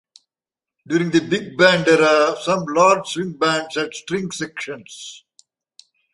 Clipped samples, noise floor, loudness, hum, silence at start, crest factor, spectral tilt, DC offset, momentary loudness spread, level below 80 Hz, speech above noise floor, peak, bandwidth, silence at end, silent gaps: under 0.1%; -90 dBFS; -18 LUFS; none; 0.9 s; 18 dB; -4.5 dB/octave; under 0.1%; 16 LU; -62 dBFS; 71 dB; -2 dBFS; 11.5 kHz; 0.95 s; none